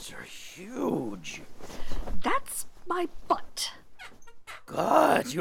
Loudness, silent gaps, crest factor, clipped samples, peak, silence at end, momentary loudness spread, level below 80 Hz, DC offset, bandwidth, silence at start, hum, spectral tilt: -29 LUFS; none; 22 dB; under 0.1%; -6 dBFS; 0 s; 22 LU; -44 dBFS; under 0.1%; 16.5 kHz; 0 s; none; -4 dB/octave